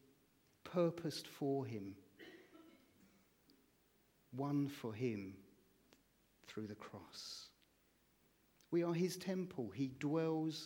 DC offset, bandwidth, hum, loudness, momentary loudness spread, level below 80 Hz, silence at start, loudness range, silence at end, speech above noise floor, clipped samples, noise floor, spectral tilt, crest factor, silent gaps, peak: under 0.1%; 17.5 kHz; none; -43 LUFS; 20 LU; -84 dBFS; 0.65 s; 7 LU; 0 s; 34 dB; under 0.1%; -76 dBFS; -6.5 dB/octave; 20 dB; none; -24 dBFS